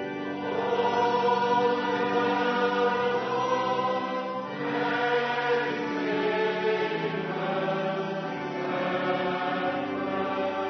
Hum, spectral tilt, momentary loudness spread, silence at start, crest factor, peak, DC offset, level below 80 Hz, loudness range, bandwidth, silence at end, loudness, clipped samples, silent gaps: none; -6 dB/octave; 6 LU; 0 s; 14 dB; -12 dBFS; under 0.1%; -72 dBFS; 4 LU; 6.4 kHz; 0 s; -27 LUFS; under 0.1%; none